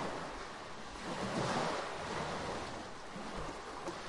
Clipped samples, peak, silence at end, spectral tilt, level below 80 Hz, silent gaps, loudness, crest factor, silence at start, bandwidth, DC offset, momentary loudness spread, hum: under 0.1%; -24 dBFS; 0 s; -4 dB/octave; -58 dBFS; none; -41 LUFS; 18 dB; 0 s; 11.5 kHz; under 0.1%; 10 LU; none